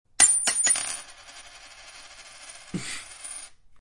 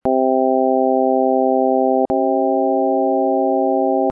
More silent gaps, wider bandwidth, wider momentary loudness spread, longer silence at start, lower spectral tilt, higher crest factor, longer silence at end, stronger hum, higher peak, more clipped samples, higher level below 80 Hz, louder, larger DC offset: neither; first, 11.5 kHz vs 2 kHz; first, 27 LU vs 1 LU; first, 0.2 s vs 0.05 s; second, 0.5 dB/octave vs -11.5 dB/octave; first, 26 dB vs 10 dB; about the same, 0 s vs 0 s; neither; first, -2 dBFS vs -6 dBFS; neither; about the same, -60 dBFS vs -56 dBFS; second, -21 LUFS vs -16 LUFS; neither